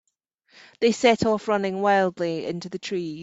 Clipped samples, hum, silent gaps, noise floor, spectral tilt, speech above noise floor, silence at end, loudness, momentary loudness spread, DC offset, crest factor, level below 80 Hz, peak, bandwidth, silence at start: under 0.1%; none; none; -69 dBFS; -5 dB/octave; 46 dB; 0 s; -23 LUFS; 10 LU; under 0.1%; 20 dB; -62 dBFS; -4 dBFS; 8 kHz; 0.8 s